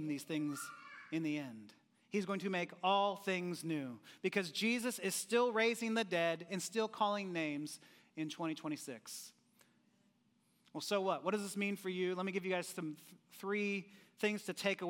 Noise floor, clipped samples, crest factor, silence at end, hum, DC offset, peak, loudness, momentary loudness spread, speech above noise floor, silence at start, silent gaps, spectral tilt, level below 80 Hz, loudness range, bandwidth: -75 dBFS; under 0.1%; 20 dB; 0 s; none; under 0.1%; -20 dBFS; -39 LUFS; 14 LU; 37 dB; 0 s; none; -4 dB/octave; under -90 dBFS; 7 LU; 16.5 kHz